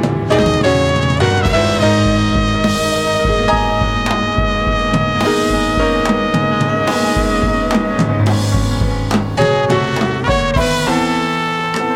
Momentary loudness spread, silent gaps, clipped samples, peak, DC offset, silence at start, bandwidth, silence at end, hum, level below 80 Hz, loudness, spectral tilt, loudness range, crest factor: 3 LU; none; under 0.1%; 0 dBFS; under 0.1%; 0 s; 16 kHz; 0 s; none; -24 dBFS; -15 LUFS; -5.5 dB/octave; 1 LU; 14 dB